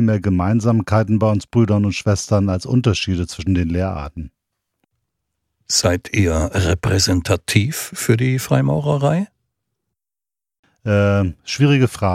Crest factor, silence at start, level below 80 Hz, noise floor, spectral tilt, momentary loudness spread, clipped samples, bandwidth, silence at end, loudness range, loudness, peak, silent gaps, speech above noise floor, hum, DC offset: 18 dB; 0 s; -38 dBFS; -90 dBFS; -5.5 dB/octave; 7 LU; under 0.1%; 15.5 kHz; 0 s; 4 LU; -18 LUFS; 0 dBFS; 10.59-10.63 s; 73 dB; none; under 0.1%